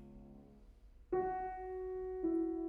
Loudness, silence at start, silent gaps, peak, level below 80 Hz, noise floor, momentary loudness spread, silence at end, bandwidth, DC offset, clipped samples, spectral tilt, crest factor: -40 LUFS; 0 s; none; -28 dBFS; -60 dBFS; -60 dBFS; 21 LU; 0 s; 2.9 kHz; under 0.1%; under 0.1%; -10 dB/octave; 14 dB